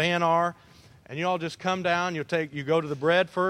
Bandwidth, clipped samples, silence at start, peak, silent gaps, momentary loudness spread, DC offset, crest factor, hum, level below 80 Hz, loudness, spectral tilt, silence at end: 13 kHz; under 0.1%; 0 s; -8 dBFS; none; 6 LU; under 0.1%; 18 dB; none; -66 dBFS; -26 LUFS; -5.5 dB/octave; 0 s